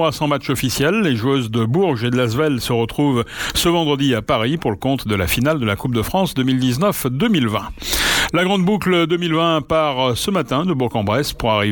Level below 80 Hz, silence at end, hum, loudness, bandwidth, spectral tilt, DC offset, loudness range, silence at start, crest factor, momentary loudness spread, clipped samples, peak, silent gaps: -38 dBFS; 0 s; none; -18 LUFS; 19 kHz; -5 dB/octave; under 0.1%; 1 LU; 0 s; 16 dB; 4 LU; under 0.1%; 0 dBFS; none